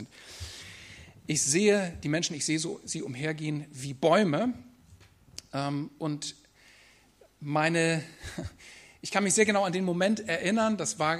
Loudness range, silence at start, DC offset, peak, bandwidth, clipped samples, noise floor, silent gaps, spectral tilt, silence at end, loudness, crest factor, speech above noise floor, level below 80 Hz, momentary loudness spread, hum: 5 LU; 0 s; under 0.1%; -8 dBFS; 14.5 kHz; under 0.1%; -60 dBFS; none; -4 dB/octave; 0 s; -28 LUFS; 22 dB; 32 dB; -60 dBFS; 20 LU; none